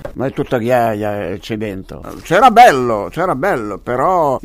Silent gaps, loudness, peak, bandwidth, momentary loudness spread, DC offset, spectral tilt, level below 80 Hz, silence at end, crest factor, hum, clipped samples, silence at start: none; -14 LUFS; 0 dBFS; 16 kHz; 15 LU; under 0.1%; -5.5 dB/octave; -40 dBFS; 0.05 s; 14 dB; none; 0.2%; 0 s